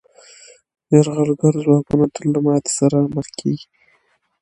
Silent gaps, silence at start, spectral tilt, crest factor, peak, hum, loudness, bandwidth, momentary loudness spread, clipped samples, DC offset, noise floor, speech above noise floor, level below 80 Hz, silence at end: none; 0.9 s; -7 dB/octave; 18 dB; 0 dBFS; none; -17 LUFS; 11.5 kHz; 9 LU; under 0.1%; under 0.1%; -62 dBFS; 46 dB; -54 dBFS; 0.8 s